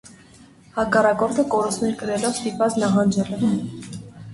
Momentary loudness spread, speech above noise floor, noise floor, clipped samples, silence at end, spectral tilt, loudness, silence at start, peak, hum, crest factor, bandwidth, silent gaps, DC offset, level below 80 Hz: 14 LU; 28 dB; -49 dBFS; under 0.1%; 0 s; -5.5 dB/octave; -21 LUFS; 0.05 s; -4 dBFS; none; 18 dB; 11.5 kHz; none; under 0.1%; -54 dBFS